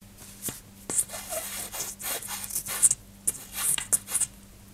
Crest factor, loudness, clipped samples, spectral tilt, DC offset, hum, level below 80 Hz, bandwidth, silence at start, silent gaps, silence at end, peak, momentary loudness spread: 28 dB; -27 LUFS; under 0.1%; -0.5 dB/octave; under 0.1%; none; -56 dBFS; 16 kHz; 0 s; none; 0 s; -2 dBFS; 14 LU